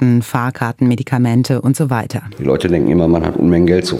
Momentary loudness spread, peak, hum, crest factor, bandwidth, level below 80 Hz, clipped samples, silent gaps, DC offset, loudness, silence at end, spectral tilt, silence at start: 7 LU; 0 dBFS; none; 14 dB; 16 kHz; -40 dBFS; under 0.1%; none; under 0.1%; -15 LUFS; 0 s; -7 dB/octave; 0 s